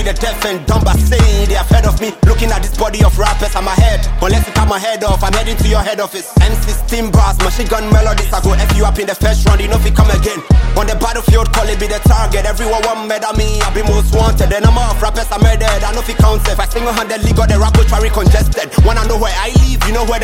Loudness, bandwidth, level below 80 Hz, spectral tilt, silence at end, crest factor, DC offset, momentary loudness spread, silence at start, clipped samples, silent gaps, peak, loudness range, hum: -13 LUFS; 16.5 kHz; -12 dBFS; -5 dB/octave; 0 s; 10 dB; under 0.1%; 5 LU; 0 s; under 0.1%; none; 0 dBFS; 1 LU; none